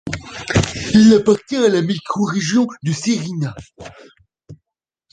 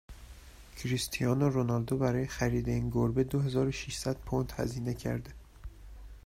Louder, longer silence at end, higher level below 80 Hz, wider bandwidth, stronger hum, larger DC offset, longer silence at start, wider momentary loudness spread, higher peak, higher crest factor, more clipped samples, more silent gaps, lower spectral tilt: first, -16 LUFS vs -32 LUFS; first, 0.6 s vs 0.05 s; first, -42 dBFS vs -48 dBFS; second, 9.4 kHz vs 16 kHz; neither; neither; about the same, 0.05 s vs 0.1 s; second, 16 LU vs 22 LU; first, -2 dBFS vs -16 dBFS; about the same, 16 dB vs 16 dB; neither; neither; about the same, -5.5 dB/octave vs -6 dB/octave